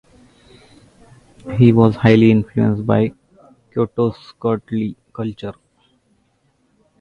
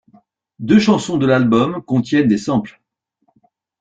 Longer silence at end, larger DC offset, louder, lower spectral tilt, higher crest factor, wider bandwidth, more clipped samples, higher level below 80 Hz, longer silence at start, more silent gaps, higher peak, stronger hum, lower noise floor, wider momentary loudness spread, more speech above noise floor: first, 1.5 s vs 1.1 s; neither; about the same, -17 LUFS vs -15 LUFS; first, -9.5 dB/octave vs -6.5 dB/octave; about the same, 18 dB vs 16 dB; second, 6.4 kHz vs 9 kHz; neither; about the same, -48 dBFS vs -52 dBFS; first, 1.45 s vs 0.6 s; neither; about the same, 0 dBFS vs -2 dBFS; neither; second, -62 dBFS vs -66 dBFS; first, 16 LU vs 8 LU; second, 47 dB vs 51 dB